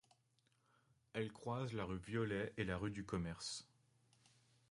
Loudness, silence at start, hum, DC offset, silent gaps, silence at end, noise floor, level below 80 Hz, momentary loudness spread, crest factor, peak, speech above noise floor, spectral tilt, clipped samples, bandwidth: -45 LUFS; 1.15 s; none; under 0.1%; none; 1.05 s; -79 dBFS; -64 dBFS; 5 LU; 20 dB; -28 dBFS; 36 dB; -5.5 dB/octave; under 0.1%; 11.5 kHz